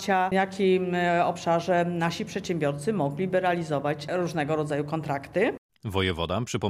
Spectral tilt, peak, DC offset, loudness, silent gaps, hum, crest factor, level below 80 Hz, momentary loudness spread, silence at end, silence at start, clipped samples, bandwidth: -6 dB/octave; -10 dBFS; under 0.1%; -27 LUFS; 5.58-5.69 s; none; 16 dB; -56 dBFS; 6 LU; 0 s; 0 s; under 0.1%; 14.5 kHz